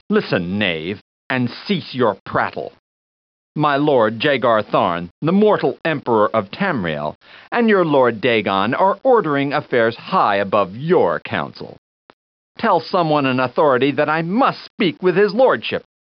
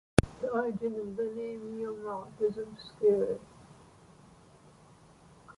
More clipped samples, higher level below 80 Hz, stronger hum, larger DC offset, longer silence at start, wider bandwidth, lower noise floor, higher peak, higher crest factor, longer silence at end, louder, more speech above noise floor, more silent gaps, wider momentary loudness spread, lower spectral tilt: neither; second, -60 dBFS vs -50 dBFS; neither; neither; about the same, 0.1 s vs 0.2 s; second, 6 kHz vs 11.5 kHz; first, under -90 dBFS vs -58 dBFS; about the same, -2 dBFS vs -4 dBFS; second, 14 dB vs 28 dB; first, 0.35 s vs 0.05 s; first, -17 LUFS vs -33 LUFS; first, over 73 dB vs 25 dB; first, 1.01-1.30 s, 2.20-2.26 s, 2.79-3.55 s, 5.11-5.22 s, 7.15-7.21 s, 11.78-12.55 s, 14.70-14.78 s vs none; second, 9 LU vs 13 LU; second, -4 dB/octave vs -6.5 dB/octave